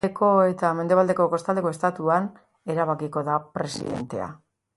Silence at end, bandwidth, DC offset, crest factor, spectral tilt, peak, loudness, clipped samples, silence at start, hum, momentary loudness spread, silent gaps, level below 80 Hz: 0.4 s; 11.5 kHz; under 0.1%; 18 dB; -6.5 dB/octave; -6 dBFS; -24 LUFS; under 0.1%; 0.05 s; none; 12 LU; none; -62 dBFS